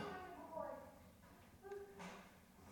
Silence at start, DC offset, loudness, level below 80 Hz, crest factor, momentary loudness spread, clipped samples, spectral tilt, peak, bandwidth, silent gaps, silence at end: 0 s; under 0.1%; -55 LUFS; -74 dBFS; 20 dB; 14 LU; under 0.1%; -5 dB/octave; -36 dBFS; 18 kHz; none; 0 s